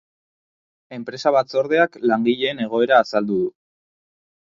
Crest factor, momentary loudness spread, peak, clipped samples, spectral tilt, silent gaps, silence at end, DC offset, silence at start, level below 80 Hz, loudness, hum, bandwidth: 20 dB; 12 LU; 0 dBFS; under 0.1%; -5.5 dB/octave; none; 1 s; under 0.1%; 0.9 s; -66 dBFS; -19 LUFS; none; 7.4 kHz